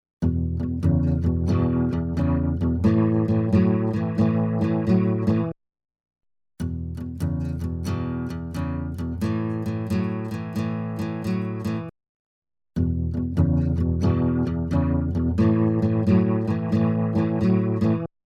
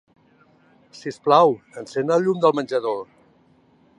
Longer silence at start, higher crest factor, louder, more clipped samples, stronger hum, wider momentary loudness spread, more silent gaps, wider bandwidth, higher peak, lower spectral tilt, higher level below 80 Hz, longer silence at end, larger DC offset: second, 0.2 s vs 0.95 s; about the same, 16 dB vs 20 dB; second, -24 LUFS vs -20 LUFS; neither; neither; second, 9 LU vs 16 LU; first, 12.09-12.42 s vs none; about the same, 11.5 kHz vs 10.5 kHz; second, -8 dBFS vs -2 dBFS; first, -9.5 dB/octave vs -6 dB/octave; first, -38 dBFS vs -74 dBFS; second, 0.2 s vs 0.95 s; neither